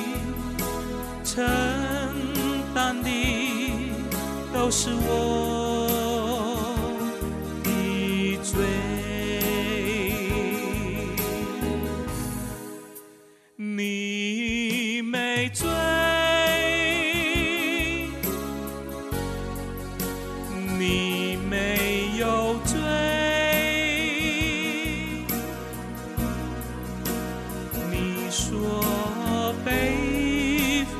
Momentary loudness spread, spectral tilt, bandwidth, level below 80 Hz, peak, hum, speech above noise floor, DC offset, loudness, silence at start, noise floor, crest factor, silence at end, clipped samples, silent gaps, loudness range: 10 LU; -4 dB/octave; 14 kHz; -40 dBFS; -10 dBFS; none; 29 dB; under 0.1%; -26 LUFS; 0 s; -53 dBFS; 16 dB; 0 s; under 0.1%; none; 7 LU